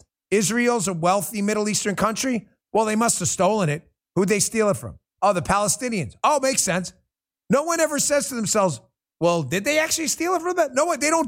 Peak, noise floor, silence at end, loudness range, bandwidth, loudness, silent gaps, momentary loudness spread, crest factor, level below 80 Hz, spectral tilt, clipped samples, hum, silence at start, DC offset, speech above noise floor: -4 dBFS; -72 dBFS; 0 s; 1 LU; 16.5 kHz; -22 LUFS; none; 6 LU; 18 dB; -54 dBFS; -3.5 dB/octave; under 0.1%; none; 0.3 s; under 0.1%; 51 dB